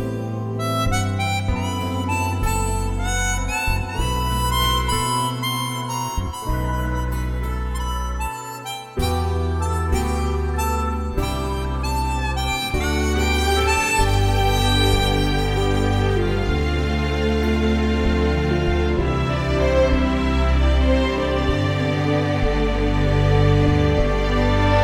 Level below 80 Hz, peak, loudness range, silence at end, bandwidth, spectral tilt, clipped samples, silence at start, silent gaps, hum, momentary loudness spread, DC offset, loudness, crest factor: -24 dBFS; -4 dBFS; 5 LU; 0 s; 17.5 kHz; -5.5 dB/octave; under 0.1%; 0 s; none; none; 7 LU; under 0.1%; -21 LUFS; 14 dB